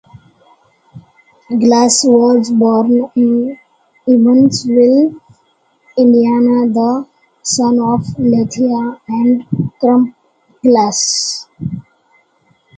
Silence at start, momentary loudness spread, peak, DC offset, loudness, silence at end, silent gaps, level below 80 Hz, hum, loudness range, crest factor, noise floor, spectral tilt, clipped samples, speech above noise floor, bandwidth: 0.95 s; 11 LU; 0 dBFS; under 0.1%; -12 LUFS; 0.95 s; none; -52 dBFS; none; 3 LU; 12 dB; -56 dBFS; -5 dB/octave; under 0.1%; 46 dB; 9.4 kHz